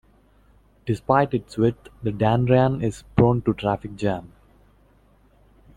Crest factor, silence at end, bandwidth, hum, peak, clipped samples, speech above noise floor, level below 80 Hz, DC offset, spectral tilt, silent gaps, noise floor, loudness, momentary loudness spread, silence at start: 20 dB; 1.5 s; 10.5 kHz; 50 Hz at -45 dBFS; -2 dBFS; under 0.1%; 35 dB; -46 dBFS; under 0.1%; -8 dB/octave; none; -57 dBFS; -22 LUFS; 11 LU; 0.85 s